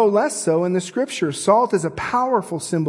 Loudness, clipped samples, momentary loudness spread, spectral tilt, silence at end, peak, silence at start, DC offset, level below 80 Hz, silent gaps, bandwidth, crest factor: -20 LUFS; under 0.1%; 6 LU; -5 dB/octave; 0 s; -2 dBFS; 0 s; under 0.1%; -58 dBFS; none; 12 kHz; 18 dB